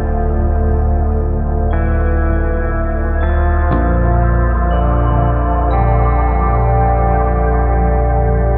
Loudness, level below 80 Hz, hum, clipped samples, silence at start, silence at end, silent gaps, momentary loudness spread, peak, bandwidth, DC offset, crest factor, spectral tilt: -15 LUFS; -14 dBFS; none; under 0.1%; 0 s; 0 s; none; 4 LU; -2 dBFS; 3.5 kHz; under 0.1%; 12 dB; -12 dB/octave